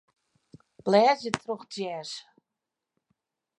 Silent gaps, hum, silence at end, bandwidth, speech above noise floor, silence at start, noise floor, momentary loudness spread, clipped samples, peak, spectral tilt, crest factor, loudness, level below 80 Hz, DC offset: none; none; 1.4 s; 11.5 kHz; 61 dB; 0.85 s; -87 dBFS; 16 LU; under 0.1%; -2 dBFS; -4.5 dB/octave; 28 dB; -27 LUFS; -72 dBFS; under 0.1%